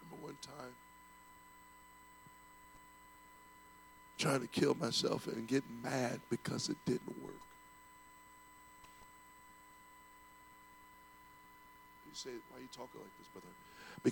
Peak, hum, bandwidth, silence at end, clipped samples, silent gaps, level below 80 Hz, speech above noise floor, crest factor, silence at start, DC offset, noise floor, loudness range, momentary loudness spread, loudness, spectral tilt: -20 dBFS; none; 19 kHz; 0 s; under 0.1%; none; -74 dBFS; 21 dB; 24 dB; 0 s; under 0.1%; -61 dBFS; 21 LU; 24 LU; -40 LUFS; -4.5 dB/octave